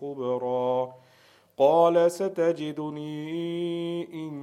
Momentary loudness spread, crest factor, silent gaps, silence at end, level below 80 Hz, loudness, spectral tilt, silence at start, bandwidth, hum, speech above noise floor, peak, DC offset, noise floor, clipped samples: 14 LU; 18 dB; none; 0 s; -80 dBFS; -26 LUFS; -6.5 dB/octave; 0 s; 13.5 kHz; none; 34 dB; -8 dBFS; under 0.1%; -59 dBFS; under 0.1%